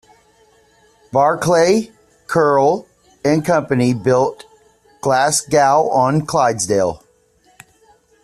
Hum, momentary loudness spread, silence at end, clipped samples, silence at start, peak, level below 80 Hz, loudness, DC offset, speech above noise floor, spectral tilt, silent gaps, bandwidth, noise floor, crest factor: none; 8 LU; 1.3 s; under 0.1%; 1.15 s; -2 dBFS; -54 dBFS; -16 LUFS; under 0.1%; 41 dB; -5 dB/octave; none; 14 kHz; -56 dBFS; 16 dB